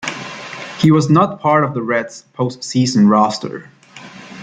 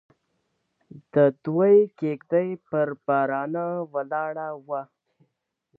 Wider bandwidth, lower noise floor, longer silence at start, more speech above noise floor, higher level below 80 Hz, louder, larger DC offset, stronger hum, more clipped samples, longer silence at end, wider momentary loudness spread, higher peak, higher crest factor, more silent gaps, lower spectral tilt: first, 9.4 kHz vs 4 kHz; second, -38 dBFS vs -76 dBFS; second, 0 s vs 0.95 s; second, 23 dB vs 52 dB; first, -56 dBFS vs -78 dBFS; first, -15 LUFS vs -24 LUFS; neither; neither; neither; second, 0 s vs 0.95 s; first, 19 LU vs 13 LU; first, -2 dBFS vs -8 dBFS; about the same, 14 dB vs 18 dB; neither; second, -6 dB/octave vs -11 dB/octave